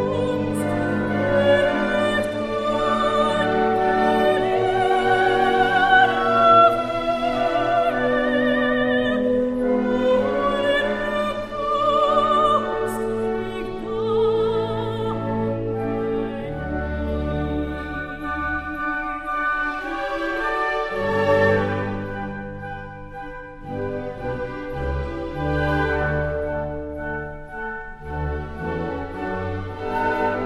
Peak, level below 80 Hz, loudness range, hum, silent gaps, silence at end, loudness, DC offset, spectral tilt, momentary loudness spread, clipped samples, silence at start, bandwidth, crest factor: -4 dBFS; -38 dBFS; 10 LU; none; none; 0 s; -21 LUFS; under 0.1%; -6.5 dB/octave; 12 LU; under 0.1%; 0 s; 14 kHz; 18 dB